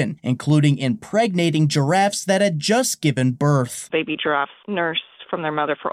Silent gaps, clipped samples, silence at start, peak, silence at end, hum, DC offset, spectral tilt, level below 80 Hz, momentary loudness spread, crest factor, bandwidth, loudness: none; under 0.1%; 0 s; -6 dBFS; 0 s; none; under 0.1%; -5 dB/octave; -64 dBFS; 7 LU; 14 dB; 15.5 kHz; -20 LUFS